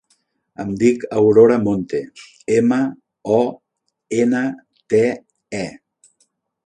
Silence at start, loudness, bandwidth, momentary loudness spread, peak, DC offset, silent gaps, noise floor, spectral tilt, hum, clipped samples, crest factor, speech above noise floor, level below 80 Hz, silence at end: 0.6 s; -18 LUFS; 9.6 kHz; 18 LU; 0 dBFS; under 0.1%; none; -65 dBFS; -7 dB/octave; none; under 0.1%; 18 dB; 48 dB; -56 dBFS; 0.95 s